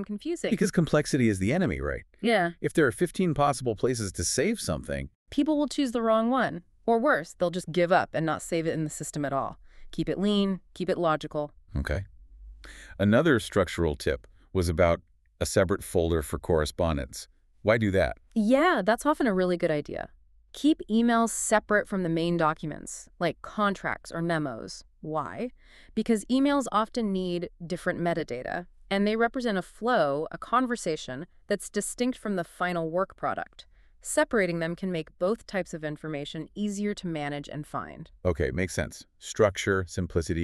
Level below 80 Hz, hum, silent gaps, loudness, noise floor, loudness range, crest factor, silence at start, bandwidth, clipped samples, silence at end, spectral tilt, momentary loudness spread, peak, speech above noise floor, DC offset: -46 dBFS; none; 5.15-5.26 s; -28 LUFS; -48 dBFS; 5 LU; 20 dB; 0 s; 13.5 kHz; under 0.1%; 0 s; -5.5 dB/octave; 12 LU; -8 dBFS; 20 dB; under 0.1%